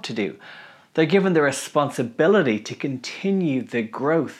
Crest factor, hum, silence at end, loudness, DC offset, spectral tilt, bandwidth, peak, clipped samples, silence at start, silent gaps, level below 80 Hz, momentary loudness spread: 16 dB; none; 0 s; -22 LUFS; under 0.1%; -5.5 dB/octave; 14.5 kHz; -6 dBFS; under 0.1%; 0.05 s; none; -78 dBFS; 11 LU